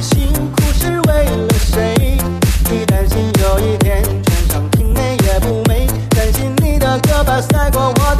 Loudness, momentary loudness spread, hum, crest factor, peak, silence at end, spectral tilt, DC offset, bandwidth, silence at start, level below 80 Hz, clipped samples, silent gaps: -14 LUFS; 2 LU; none; 12 dB; 0 dBFS; 0 s; -5.5 dB/octave; under 0.1%; 14 kHz; 0 s; -16 dBFS; under 0.1%; none